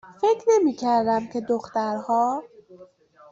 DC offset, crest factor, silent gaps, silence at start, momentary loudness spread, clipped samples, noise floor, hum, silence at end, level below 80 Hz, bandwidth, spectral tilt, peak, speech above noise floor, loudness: under 0.1%; 16 dB; none; 0.05 s; 7 LU; under 0.1%; -51 dBFS; none; 0.45 s; -66 dBFS; 7.8 kHz; -5 dB/octave; -8 dBFS; 29 dB; -23 LUFS